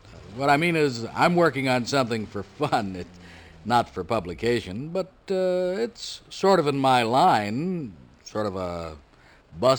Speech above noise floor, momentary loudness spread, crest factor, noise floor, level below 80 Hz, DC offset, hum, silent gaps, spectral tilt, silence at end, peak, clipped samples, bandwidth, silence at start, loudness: 27 dB; 15 LU; 18 dB; -51 dBFS; -54 dBFS; under 0.1%; none; none; -5.5 dB/octave; 0 s; -6 dBFS; under 0.1%; over 20 kHz; 0.05 s; -24 LUFS